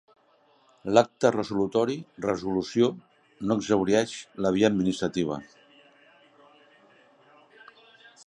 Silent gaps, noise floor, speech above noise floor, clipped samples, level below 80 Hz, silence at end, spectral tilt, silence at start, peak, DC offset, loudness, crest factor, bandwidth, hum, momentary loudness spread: none; -63 dBFS; 38 dB; under 0.1%; -60 dBFS; 2.8 s; -5.5 dB/octave; 0.85 s; -4 dBFS; under 0.1%; -26 LUFS; 24 dB; 11 kHz; none; 10 LU